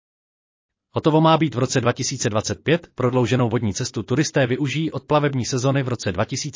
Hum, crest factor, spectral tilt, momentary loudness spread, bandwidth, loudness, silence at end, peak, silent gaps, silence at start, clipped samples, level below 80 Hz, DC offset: none; 16 dB; -5.5 dB/octave; 7 LU; 7.6 kHz; -21 LUFS; 0 s; -4 dBFS; none; 0.95 s; under 0.1%; -50 dBFS; under 0.1%